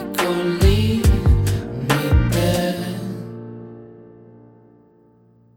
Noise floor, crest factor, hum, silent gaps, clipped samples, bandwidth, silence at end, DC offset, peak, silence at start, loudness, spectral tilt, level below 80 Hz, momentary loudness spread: -53 dBFS; 18 dB; none; none; under 0.1%; 18.5 kHz; 1.55 s; under 0.1%; -2 dBFS; 0 s; -19 LUFS; -6 dB/octave; -26 dBFS; 19 LU